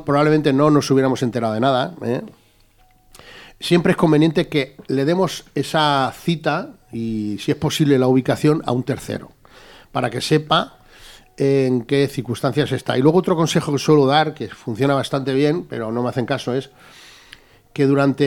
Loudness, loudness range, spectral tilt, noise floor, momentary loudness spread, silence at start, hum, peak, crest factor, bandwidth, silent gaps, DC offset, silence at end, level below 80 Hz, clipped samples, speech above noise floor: -19 LUFS; 4 LU; -6 dB/octave; -54 dBFS; 10 LU; 0 s; none; 0 dBFS; 18 dB; 17 kHz; none; under 0.1%; 0 s; -52 dBFS; under 0.1%; 36 dB